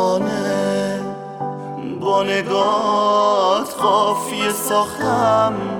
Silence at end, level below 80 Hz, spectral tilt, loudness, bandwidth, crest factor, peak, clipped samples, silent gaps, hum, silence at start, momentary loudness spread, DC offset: 0 s; -58 dBFS; -4 dB/octave; -18 LUFS; 19 kHz; 14 dB; -4 dBFS; under 0.1%; none; none; 0 s; 12 LU; under 0.1%